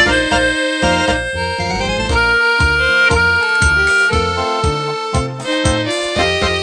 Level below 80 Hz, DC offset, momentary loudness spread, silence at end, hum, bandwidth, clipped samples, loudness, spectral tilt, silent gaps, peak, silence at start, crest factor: -26 dBFS; under 0.1%; 7 LU; 0 s; none; 10 kHz; under 0.1%; -14 LUFS; -4 dB/octave; none; 0 dBFS; 0 s; 14 dB